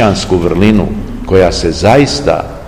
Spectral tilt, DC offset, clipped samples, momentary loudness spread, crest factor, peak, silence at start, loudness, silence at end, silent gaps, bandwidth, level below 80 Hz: -5.5 dB/octave; 1%; 2%; 6 LU; 10 dB; 0 dBFS; 0 s; -10 LUFS; 0 s; none; 15.5 kHz; -24 dBFS